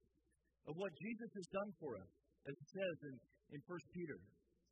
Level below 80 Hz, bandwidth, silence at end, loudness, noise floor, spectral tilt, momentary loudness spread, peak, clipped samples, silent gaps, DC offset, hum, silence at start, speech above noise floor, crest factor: -84 dBFS; 6.2 kHz; 0.4 s; -50 LUFS; -83 dBFS; -5.5 dB/octave; 12 LU; -32 dBFS; under 0.1%; none; under 0.1%; none; 0.65 s; 33 dB; 20 dB